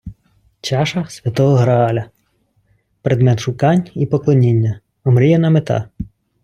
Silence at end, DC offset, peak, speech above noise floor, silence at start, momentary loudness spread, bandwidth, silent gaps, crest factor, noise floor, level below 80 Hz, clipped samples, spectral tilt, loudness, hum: 0.4 s; under 0.1%; -2 dBFS; 48 dB; 0.05 s; 12 LU; 10 kHz; none; 14 dB; -62 dBFS; -46 dBFS; under 0.1%; -7.5 dB/octave; -16 LUFS; none